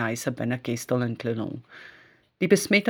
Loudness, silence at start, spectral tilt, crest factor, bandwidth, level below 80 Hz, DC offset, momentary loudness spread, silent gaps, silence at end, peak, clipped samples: -27 LUFS; 0 s; -5 dB/octave; 20 dB; over 20 kHz; -66 dBFS; under 0.1%; 22 LU; none; 0 s; -6 dBFS; under 0.1%